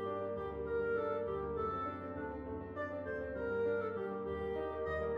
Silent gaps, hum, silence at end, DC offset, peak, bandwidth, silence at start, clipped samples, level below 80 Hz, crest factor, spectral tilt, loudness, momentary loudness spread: none; none; 0 s; under 0.1%; -26 dBFS; 5.2 kHz; 0 s; under 0.1%; -56 dBFS; 12 dB; -9 dB/octave; -39 LUFS; 7 LU